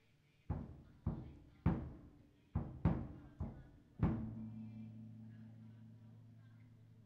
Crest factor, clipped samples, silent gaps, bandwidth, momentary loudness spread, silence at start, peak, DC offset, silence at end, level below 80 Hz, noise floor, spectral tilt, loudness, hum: 22 dB; under 0.1%; none; 5 kHz; 22 LU; 0.5 s; -22 dBFS; under 0.1%; 0 s; -54 dBFS; -70 dBFS; -10 dB/octave; -45 LUFS; none